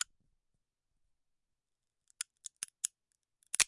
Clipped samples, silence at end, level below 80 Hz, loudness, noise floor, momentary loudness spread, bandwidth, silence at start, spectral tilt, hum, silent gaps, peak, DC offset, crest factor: under 0.1%; 0 s; -78 dBFS; -41 LUFS; -88 dBFS; 6 LU; 11.5 kHz; 2.6 s; 3 dB/octave; none; none; -8 dBFS; under 0.1%; 36 dB